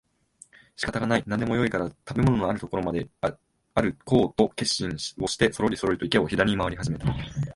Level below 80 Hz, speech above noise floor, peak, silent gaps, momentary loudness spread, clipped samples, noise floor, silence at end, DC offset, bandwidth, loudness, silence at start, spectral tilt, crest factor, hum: -46 dBFS; 31 dB; -4 dBFS; none; 8 LU; under 0.1%; -56 dBFS; 0.05 s; under 0.1%; 11.5 kHz; -26 LUFS; 0.8 s; -5.5 dB/octave; 22 dB; none